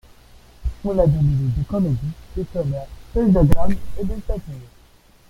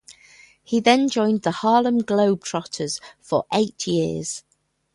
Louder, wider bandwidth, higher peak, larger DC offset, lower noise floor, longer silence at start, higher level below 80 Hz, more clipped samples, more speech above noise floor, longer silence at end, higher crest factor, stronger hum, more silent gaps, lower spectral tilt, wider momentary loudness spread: about the same, -22 LUFS vs -21 LUFS; first, 14 kHz vs 11.5 kHz; about the same, -2 dBFS vs 0 dBFS; neither; about the same, -51 dBFS vs -51 dBFS; first, 0.6 s vs 0.1 s; first, -30 dBFS vs -62 dBFS; neither; about the same, 33 dB vs 31 dB; about the same, 0.65 s vs 0.55 s; about the same, 18 dB vs 22 dB; neither; neither; first, -9.5 dB/octave vs -4.5 dB/octave; first, 14 LU vs 11 LU